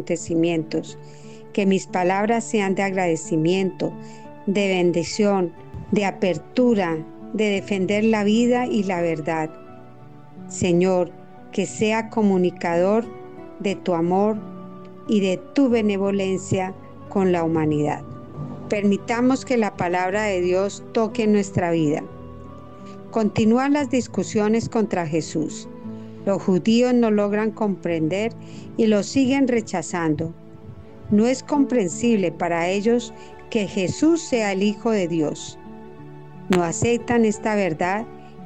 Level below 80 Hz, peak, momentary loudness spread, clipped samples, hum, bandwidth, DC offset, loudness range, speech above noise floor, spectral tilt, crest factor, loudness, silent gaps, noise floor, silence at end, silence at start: -56 dBFS; -8 dBFS; 18 LU; under 0.1%; none; 9.2 kHz; 0.5%; 2 LU; 24 dB; -6 dB/octave; 14 dB; -22 LUFS; none; -44 dBFS; 0 s; 0 s